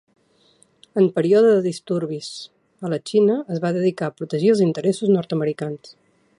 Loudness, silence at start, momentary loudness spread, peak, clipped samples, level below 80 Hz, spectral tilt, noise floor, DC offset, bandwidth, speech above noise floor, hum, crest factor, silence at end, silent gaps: -20 LUFS; 0.95 s; 14 LU; -6 dBFS; under 0.1%; -70 dBFS; -7 dB/octave; -58 dBFS; under 0.1%; 11 kHz; 39 dB; none; 16 dB; 0.5 s; none